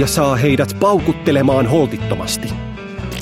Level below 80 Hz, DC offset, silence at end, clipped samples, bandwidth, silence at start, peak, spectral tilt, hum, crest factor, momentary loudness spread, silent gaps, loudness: -36 dBFS; under 0.1%; 0 s; under 0.1%; 16.5 kHz; 0 s; 0 dBFS; -5.5 dB/octave; none; 14 dB; 12 LU; none; -16 LUFS